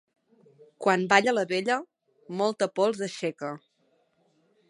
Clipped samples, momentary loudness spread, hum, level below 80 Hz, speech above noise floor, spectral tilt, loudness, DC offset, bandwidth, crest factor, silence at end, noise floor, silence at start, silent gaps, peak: under 0.1%; 16 LU; none; -78 dBFS; 44 dB; -4 dB/octave; -26 LUFS; under 0.1%; 11.5 kHz; 24 dB; 1.15 s; -70 dBFS; 0.8 s; none; -4 dBFS